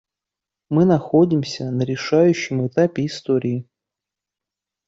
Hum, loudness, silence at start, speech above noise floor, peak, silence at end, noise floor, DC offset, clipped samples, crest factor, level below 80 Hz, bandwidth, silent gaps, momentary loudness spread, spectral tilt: none; -19 LUFS; 0.7 s; 68 dB; -4 dBFS; 1.25 s; -87 dBFS; under 0.1%; under 0.1%; 16 dB; -60 dBFS; 7.8 kHz; none; 9 LU; -7 dB/octave